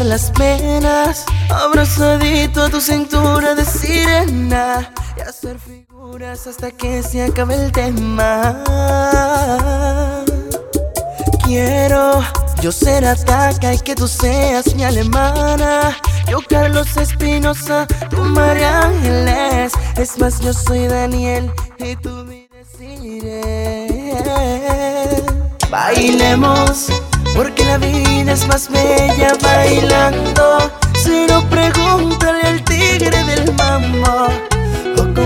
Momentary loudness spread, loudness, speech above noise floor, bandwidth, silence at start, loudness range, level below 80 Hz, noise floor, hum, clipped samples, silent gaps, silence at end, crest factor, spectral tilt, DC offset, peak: 10 LU; -14 LUFS; 25 dB; 17.5 kHz; 0 s; 8 LU; -20 dBFS; -38 dBFS; none; under 0.1%; none; 0 s; 14 dB; -5 dB/octave; under 0.1%; 0 dBFS